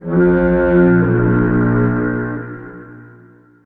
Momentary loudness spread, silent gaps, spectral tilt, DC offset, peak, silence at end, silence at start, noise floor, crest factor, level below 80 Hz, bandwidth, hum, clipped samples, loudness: 17 LU; none; -12.5 dB/octave; under 0.1%; -2 dBFS; 0.6 s; 0 s; -45 dBFS; 14 dB; -32 dBFS; 3.7 kHz; none; under 0.1%; -14 LUFS